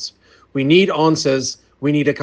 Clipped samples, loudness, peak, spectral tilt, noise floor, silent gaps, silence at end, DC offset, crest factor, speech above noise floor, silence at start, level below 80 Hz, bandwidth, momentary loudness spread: under 0.1%; -16 LUFS; 0 dBFS; -5 dB/octave; -36 dBFS; none; 0 s; under 0.1%; 16 dB; 21 dB; 0 s; -58 dBFS; 9.8 kHz; 13 LU